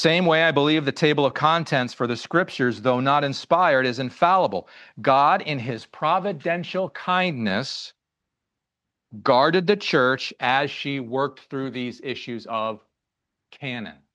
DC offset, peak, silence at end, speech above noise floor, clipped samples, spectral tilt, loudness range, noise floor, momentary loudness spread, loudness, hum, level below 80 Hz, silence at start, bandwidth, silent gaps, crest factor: under 0.1%; -4 dBFS; 0.2 s; 61 dB; under 0.1%; -5.5 dB/octave; 6 LU; -84 dBFS; 13 LU; -22 LUFS; none; -72 dBFS; 0 s; 10 kHz; none; 20 dB